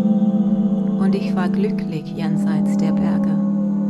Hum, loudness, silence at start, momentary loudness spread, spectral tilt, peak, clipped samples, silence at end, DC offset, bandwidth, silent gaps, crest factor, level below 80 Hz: none; -19 LUFS; 0 s; 5 LU; -9 dB/octave; -8 dBFS; under 0.1%; 0 s; under 0.1%; 8.2 kHz; none; 10 dB; -52 dBFS